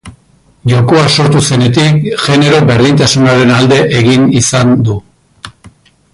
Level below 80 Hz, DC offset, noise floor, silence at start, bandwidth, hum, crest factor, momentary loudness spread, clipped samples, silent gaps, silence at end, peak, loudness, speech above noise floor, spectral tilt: -38 dBFS; under 0.1%; -46 dBFS; 0.05 s; 11.5 kHz; none; 8 dB; 4 LU; under 0.1%; none; 0.65 s; 0 dBFS; -8 LUFS; 39 dB; -5 dB/octave